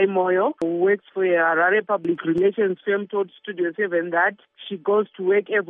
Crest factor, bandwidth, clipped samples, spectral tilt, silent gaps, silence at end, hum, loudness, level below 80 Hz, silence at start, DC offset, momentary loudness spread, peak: 14 dB; 3.8 kHz; under 0.1%; -4 dB/octave; none; 0.05 s; none; -22 LUFS; -70 dBFS; 0 s; under 0.1%; 8 LU; -8 dBFS